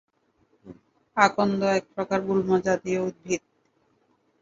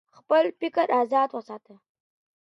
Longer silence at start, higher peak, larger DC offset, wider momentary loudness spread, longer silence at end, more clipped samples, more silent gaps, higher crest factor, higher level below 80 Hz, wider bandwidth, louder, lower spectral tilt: first, 0.65 s vs 0.3 s; first, -2 dBFS vs -10 dBFS; neither; second, 10 LU vs 18 LU; first, 1.05 s vs 0.85 s; neither; neither; first, 24 dB vs 16 dB; first, -64 dBFS vs -82 dBFS; about the same, 7.8 kHz vs 7.6 kHz; about the same, -25 LUFS vs -24 LUFS; about the same, -5.5 dB/octave vs -5.5 dB/octave